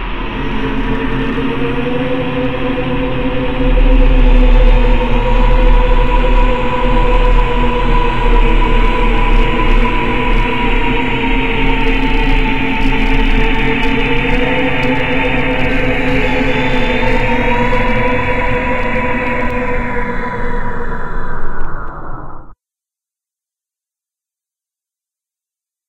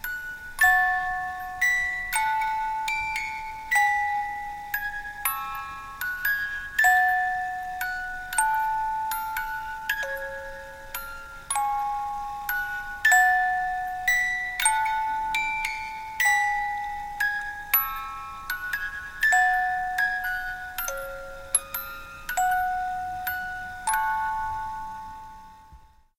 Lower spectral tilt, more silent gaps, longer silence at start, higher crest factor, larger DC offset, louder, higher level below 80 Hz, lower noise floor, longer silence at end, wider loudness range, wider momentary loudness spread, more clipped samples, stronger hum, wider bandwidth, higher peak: first, -7 dB/octave vs 0 dB/octave; neither; about the same, 0 s vs 0 s; second, 12 dB vs 20 dB; first, 10% vs under 0.1%; first, -15 LUFS vs -26 LUFS; first, -14 dBFS vs -48 dBFS; first, -87 dBFS vs -52 dBFS; second, 0 s vs 0.35 s; about the same, 8 LU vs 6 LU; second, 7 LU vs 14 LU; neither; neither; second, 5.2 kHz vs 17 kHz; first, 0 dBFS vs -8 dBFS